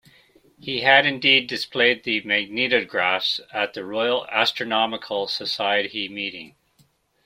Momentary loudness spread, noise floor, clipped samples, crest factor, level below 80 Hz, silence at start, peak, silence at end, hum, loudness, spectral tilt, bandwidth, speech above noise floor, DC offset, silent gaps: 11 LU; -62 dBFS; under 0.1%; 22 dB; -68 dBFS; 0.65 s; 0 dBFS; 0.75 s; none; -21 LUFS; -3.5 dB/octave; 16 kHz; 40 dB; under 0.1%; none